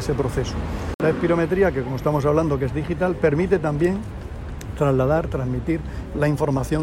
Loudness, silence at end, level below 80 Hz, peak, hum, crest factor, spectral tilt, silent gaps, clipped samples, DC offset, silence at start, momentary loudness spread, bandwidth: -22 LUFS; 0 s; -34 dBFS; -6 dBFS; none; 16 dB; -7.5 dB/octave; 0.94-0.99 s; under 0.1%; under 0.1%; 0 s; 9 LU; 16 kHz